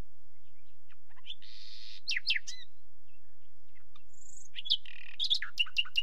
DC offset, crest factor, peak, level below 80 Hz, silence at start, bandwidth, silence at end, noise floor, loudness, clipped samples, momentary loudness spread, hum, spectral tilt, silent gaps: 3%; 24 dB; -14 dBFS; -72 dBFS; 1.25 s; 16 kHz; 0 s; -69 dBFS; -32 LUFS; under 0.1%; 19 LU; none; 1 dB/octave; none